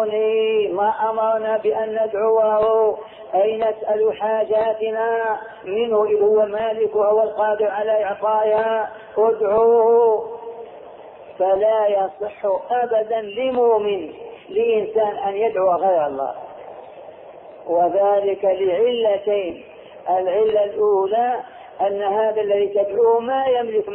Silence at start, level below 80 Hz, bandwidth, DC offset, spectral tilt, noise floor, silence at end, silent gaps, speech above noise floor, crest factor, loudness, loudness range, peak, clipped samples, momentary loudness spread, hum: 0 s; -62 dBFS; 3.8 kHz; under 0.1%; -8.5 dB/octave; -40 dBFS; 0 s; none; 21 dB; 12 dB; -19 LUFS; 3 LU; -6 dBFS; under 0.1%; 11 LU; none